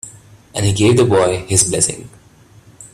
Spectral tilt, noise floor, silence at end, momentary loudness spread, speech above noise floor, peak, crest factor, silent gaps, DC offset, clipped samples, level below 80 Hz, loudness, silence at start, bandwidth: -4.5 dB/octave; -46 dBFS; 0.05 s; 16 LU; 32 dB; 0 dBFS; 16 dB; none; under 0.1%; under 0.1%; -44 dBFS; -14 LUFS; 0.05 s; 14.5 kHz